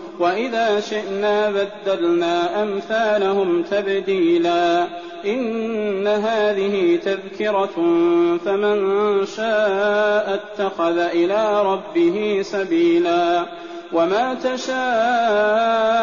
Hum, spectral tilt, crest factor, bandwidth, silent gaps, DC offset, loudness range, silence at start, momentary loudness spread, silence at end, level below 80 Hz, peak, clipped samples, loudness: none; -3 dB/octave; 10 dB; 7.2 kHz; none; 0.2%; 1 LU; 0 s; 6 LU; 0 s; -62 dBFS; -8 dBFS; under 0.1%; -19 LUFS